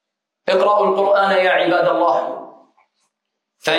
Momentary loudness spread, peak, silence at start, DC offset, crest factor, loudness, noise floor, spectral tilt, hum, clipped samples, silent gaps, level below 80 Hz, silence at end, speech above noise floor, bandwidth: 13 LU; -2 dBFS; 0.45 s; under 0.1%; 16 dB; -16 LUFS; -78 dBFS; -4.5 dB/octave; none; under 0.1%; none; -74 dBFS; 0 s; 63 dB; 14 kHz